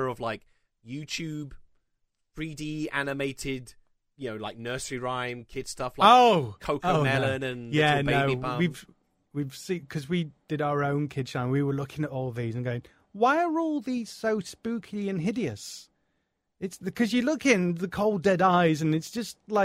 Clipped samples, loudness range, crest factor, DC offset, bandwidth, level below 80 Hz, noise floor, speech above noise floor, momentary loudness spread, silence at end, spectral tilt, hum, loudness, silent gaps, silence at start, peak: under 0.1%; 11 LU; 22 dB; under 0.1%; 16 kHz; -56 dBFS; -77 dBFS; 50 dB; 15 LU; 0 s; -5.5 dB/octave; none; -27 LUFS; none; 0 s; -6 dBFS